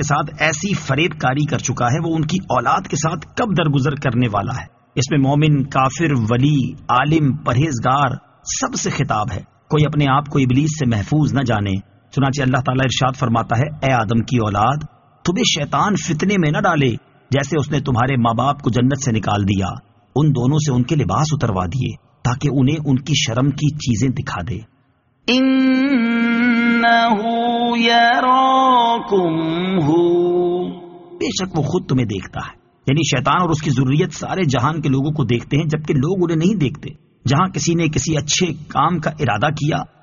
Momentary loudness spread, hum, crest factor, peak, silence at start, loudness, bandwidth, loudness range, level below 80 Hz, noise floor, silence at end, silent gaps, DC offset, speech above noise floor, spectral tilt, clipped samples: 8 LU; none; 16 dB; -2 dBFS; 0 s; -17 LUFS; 7.4 kHz; 4 LU; -44 dBFS; -59 dBFS; 0.15 s; none; under 0.1%; 42 dB; -5 dB/octave; under 0.1%